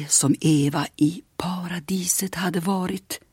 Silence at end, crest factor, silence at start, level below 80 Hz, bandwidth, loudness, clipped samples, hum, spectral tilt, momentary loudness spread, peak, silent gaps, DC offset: 0.15 s; 16 dB; 0 s; -58 dBFS; 16.5 kHz; -23 LUFS; under 0.1%; none; -4 dB/octave; 11 LU; -6 dBFS; none; under 0.1%